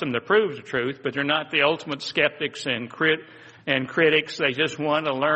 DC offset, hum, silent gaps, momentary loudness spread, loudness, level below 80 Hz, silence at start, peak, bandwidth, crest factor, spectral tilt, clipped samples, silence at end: under 0.1%; none; none; 8 LU; -23 LUFS; -68 dBFS; 0 s; -4 dBFS; 8.4 kHz; 20 dB; -4.5 dB/octave; under 0.1%; 0 s